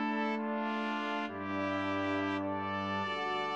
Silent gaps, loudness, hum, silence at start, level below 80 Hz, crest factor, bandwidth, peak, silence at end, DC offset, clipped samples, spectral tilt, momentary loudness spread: none; -35 LUFS; none; 0 s; -82 dBFS; 12 dB; 8.4 kHz; -22 dBFS; 0 s; under 0.1%; under 0.1%; -6 dB/octave; 3 LU